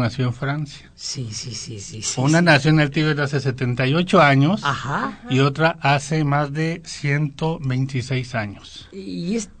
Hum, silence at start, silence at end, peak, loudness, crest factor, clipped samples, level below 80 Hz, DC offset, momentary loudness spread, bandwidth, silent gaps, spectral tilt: none; 0 s; 0.1 s; -2 dBFS; -20 LUFS; 18 dB; under 0.1%; -48 dBFS; under 0.1%; 15 LU; 9.4 kHz; none; -5.5 dB/octave